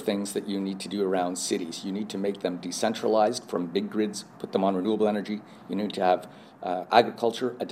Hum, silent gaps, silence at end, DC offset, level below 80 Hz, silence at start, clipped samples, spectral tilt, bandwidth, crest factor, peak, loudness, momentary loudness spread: none; none; 0 s; under 0.1%; -78 dBFS; 0 s; under 0.1%; -4.5 dB/octave; 15.5 kHz; 24 dB; -4 dBFS; -28 LUFS; 9 LU